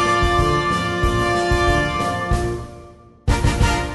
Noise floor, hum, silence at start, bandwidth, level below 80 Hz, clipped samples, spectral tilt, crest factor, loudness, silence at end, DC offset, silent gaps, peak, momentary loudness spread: -43 dBFS; none; 0 s; 11.5 kHz; -26 dBFS; under 0.1%; -5 dB/octave; 14 dB; -19 LUFS; 0 s; under 0.1%; none; -4 dBFS; 8 LU